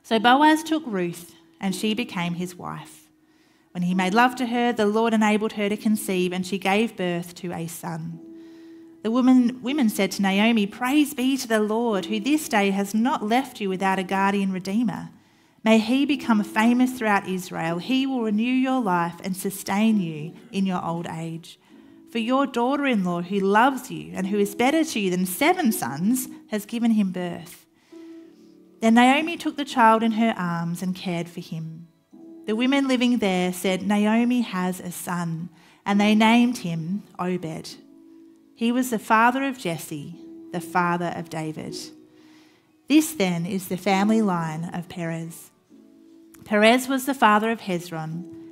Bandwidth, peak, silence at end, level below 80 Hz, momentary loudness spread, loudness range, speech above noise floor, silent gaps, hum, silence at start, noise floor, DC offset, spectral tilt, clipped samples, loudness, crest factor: 16 kHz; -2 dBFS; 0 s; -68 dBFS; 15 LU; 4 LU; 37 dB; none; none; 0.05 s; -59 dBFS; under 0.1%; -5 dB/octave; under 0.1%; -23 LUFS; 22 dB